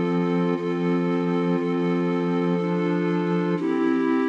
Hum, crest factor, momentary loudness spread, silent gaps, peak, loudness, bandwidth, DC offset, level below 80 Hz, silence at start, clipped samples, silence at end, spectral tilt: none; 10 dB; 1 LU; none; -12 dBFS; -23 LUFS; 7 kHz; under 0.1%; -74 dBFS; 0 s; under 0.1%; 0 s; -8.5 dB/octave